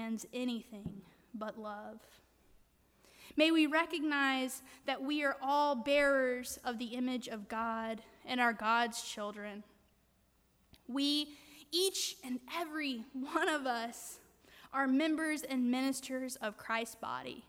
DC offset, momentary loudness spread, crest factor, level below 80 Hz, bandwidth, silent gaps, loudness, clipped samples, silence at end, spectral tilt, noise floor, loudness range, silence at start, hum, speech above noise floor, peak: under 0.1%; 15 LU; 20 dB; -72 dBFS; 17 kHz; none; -35 LUFS; under 0.1%; 0.05 s; -2.5 dB/octave; -72 dBFS; 5 LU; 0 s; none; 36 dB; -16 dBFS